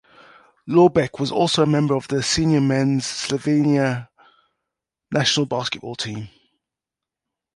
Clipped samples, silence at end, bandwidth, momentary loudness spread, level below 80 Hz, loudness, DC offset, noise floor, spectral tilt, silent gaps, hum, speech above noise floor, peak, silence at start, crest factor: under 0.1%; 1.25 s; 11.5 kHz; 12 LU; -52 dBFS; -20 LUFS; under 0.1%; -87 dBFS; -5 dB/octave; none; none; 68 dB; -2 dBFS; 0.65 s; 18 dB